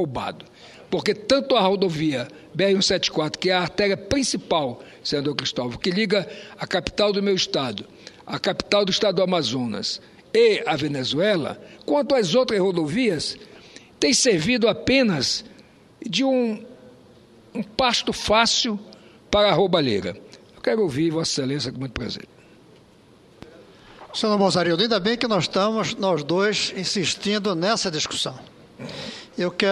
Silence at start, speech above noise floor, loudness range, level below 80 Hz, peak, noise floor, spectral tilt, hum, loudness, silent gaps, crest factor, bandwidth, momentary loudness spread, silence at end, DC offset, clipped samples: 0 s; 30 dB; 4 LU; -52 dBFS; -2 dBFS; -52 dBFS; -4 dB/octave; none; -22 LUFS; none; 22 dB; 12.5 kHz; 14 LU; 0 s; under 0.1%; under 0.1%